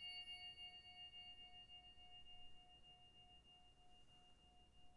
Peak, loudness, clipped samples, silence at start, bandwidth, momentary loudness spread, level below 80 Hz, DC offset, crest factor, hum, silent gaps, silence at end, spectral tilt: -46 dBFS; -58 LUFS; under 0.1%; 0 s; 12 kHz; 16 LU; -76 dBFS; under 0.1%; 16 dB; none; none; 0 s; -2 dB/octave